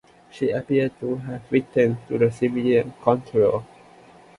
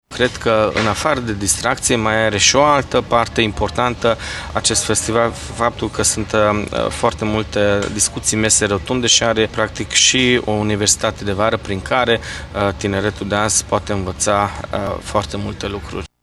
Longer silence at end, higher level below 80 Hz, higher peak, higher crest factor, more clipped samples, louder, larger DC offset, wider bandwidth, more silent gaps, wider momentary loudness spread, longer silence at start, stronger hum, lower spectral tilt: first, 0.75 s vs 0.15 s; second, -58 dBFS vs -36 dBFS; about the same, -2 dBFS vs 0 dBFS; about the same, 20 dB vs 18 dB; neither; second, -23 LUFS vs -16 LUFS; neither; second, 11 kHz vs 13 kHz; neither; about the same, 8 LU vs 9 LU; first, 0.35 s vs 0.1 s; neither; first, -8 dB/octave vs -3 dB/octave